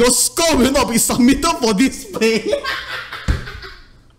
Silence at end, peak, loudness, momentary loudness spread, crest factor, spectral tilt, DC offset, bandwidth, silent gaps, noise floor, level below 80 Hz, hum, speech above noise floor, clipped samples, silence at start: 0.4 s; -4 dBFS; -16 LUFS; 12 LU; 14 dB; -3 dB/octave; under 0.1%; 16 kHz; none; -41 dBFS; -30 dBFS; none; 26 dB; under 0.1%; 0 s